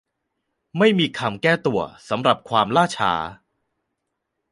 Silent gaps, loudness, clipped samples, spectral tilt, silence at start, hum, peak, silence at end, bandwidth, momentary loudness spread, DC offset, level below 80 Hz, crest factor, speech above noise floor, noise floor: none; -20 LUFS; under 0.1%; -5.5 dB/octave; 0.75 s; none; -2 dBFS; 1.2 s; 11.5 kHz; 9 LU; under 0.1%; -58 dBFS; 20 dB; 58 dB; -78 dBFS